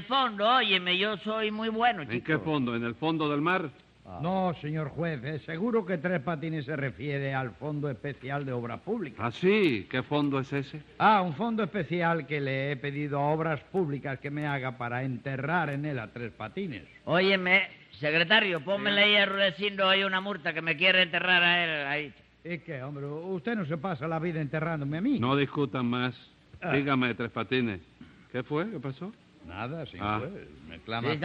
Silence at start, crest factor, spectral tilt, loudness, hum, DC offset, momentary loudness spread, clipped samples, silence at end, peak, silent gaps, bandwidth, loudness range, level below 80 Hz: 0 s; 20 dB; -7 dB/octave; -28 LUFS; none; under 0.1%; 15 LU; under 0.1%; 0 s; -10 dBFS; none; 7.8 kHz; 9 LU; -64 dBFS